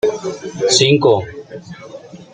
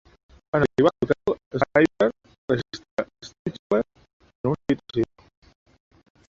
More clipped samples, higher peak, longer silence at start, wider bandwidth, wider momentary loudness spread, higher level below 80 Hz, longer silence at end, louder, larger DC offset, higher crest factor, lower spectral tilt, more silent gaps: neither; first, 0 dBFS vs -4 dBFS; second, 0.05 s vs 0.55 s; first, 9.6 kHz vs 7.8 kHz; first, 23 LU vs 14 LU; about the same, -54 dBFS vs -54 dBFS; second, 0.1 s vs 1.3 s; first, -14 LUFS vs -25 LUFS; neither; about the same, 18 dB vs 22 dB; second, -4 dB/octave vs -7 dB/octave; second, none vs 1.46-1.51 s, 2.38-2.48 s, 2.91-2.97 s, 3.39-3.45 s, 3.59-3.70 s, 4.13-4.20 s, 4.35-4.44 s